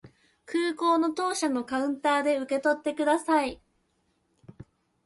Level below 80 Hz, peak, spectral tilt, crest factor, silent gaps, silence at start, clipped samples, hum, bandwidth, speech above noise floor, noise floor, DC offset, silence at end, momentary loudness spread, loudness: -64 dBFS; -12 dBFS; -3.5 dB/octave; 16 dB; none; 0.05 s; under 0.1%; none; 11.5 kHz; 46 dB; -72 dBFS; under 0.1%; 0.55 s; 5 LU; -27 LUFS